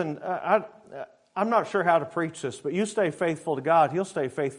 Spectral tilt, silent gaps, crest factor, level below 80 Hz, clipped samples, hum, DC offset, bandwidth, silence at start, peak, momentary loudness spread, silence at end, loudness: -5.5 dB/octave; none; 18 dB; -74 dBFS; under 0.1%; none; under 0.1%; 11 kHz; 0 s; -8 dBFS; 14 LU; 0 s; -26 LUFS